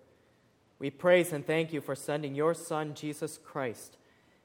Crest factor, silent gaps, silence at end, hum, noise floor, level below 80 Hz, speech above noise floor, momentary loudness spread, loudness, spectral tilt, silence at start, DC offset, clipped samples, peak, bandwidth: 22 dB; none; 0.55 s; none; -67 dBFS; -78 dBFS; 36 dB; 14 LU; -32 LUFS; -5 dB/octave; 0.8 s; under 0.1%; under 0.1%; -12 dBFS; 17.5 kHz